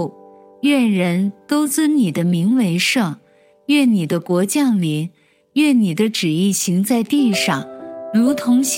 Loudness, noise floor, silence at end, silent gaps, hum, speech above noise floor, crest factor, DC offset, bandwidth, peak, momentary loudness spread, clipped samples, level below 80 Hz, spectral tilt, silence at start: -17 LUFS; -44 dBFS; 0 s; none; none; 28 dB; 12 dB; under 0.1%; 17 kHz; -4 dBFS; 9 LU; under 0.1%; -70 dBFS; -5 dB/octave; 0 s